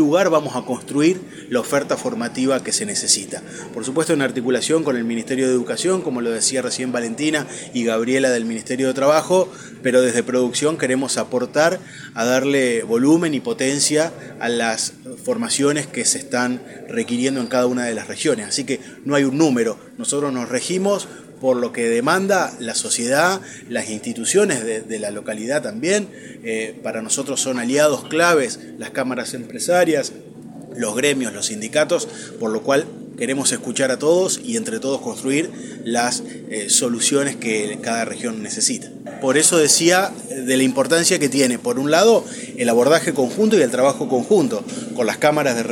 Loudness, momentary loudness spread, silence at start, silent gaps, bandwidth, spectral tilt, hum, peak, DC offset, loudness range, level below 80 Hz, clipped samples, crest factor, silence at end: -19 LUFS; 11 LU; 0 s; none; 17 kHz; -3 dB/octave; none; 0 dBFS; under 0.1%; 4 LU; -68 dBFS; under 0.1%; 20 dB; 0 s